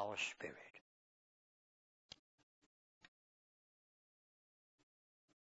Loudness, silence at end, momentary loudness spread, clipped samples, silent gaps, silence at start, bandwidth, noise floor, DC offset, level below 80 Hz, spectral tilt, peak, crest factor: -45 LUFS; 3.45 s; 19 LU; under 0.1%; 0.81-2.09 s; 0 s; 7.6 kHz; under -90 dBFS; under 0.1%; under -90 dBFS; -0.5 dB/octave; -28 dBFS; 26 dB